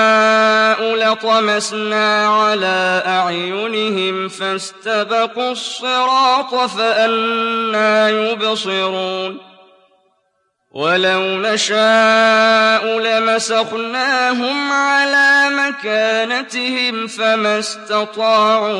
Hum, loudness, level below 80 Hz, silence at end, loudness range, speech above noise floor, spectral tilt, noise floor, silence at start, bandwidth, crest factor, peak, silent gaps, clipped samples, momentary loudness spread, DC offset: none; -15 LUFS; -76 dBFS; 0 s; 5 LU; 51 dB; -2.5 dB/octave; -66 dBFS; 0 s; 11.5 kHz; 12 dB; -2 dBFS; none; under 0.1%; 9 LU; under 0.1%